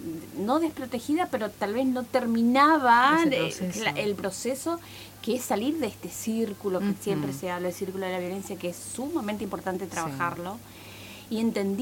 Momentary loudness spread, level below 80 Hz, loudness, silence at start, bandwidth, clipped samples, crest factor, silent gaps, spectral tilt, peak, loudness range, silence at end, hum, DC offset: 14 LU; -62 dBFS; -27 LUFS; 0 s; 17 kHz; under 0.1%; 20 dB; none; -4.5 dB/octave; -8 dBFS; 8 LU; 0 s; none; under 0.1%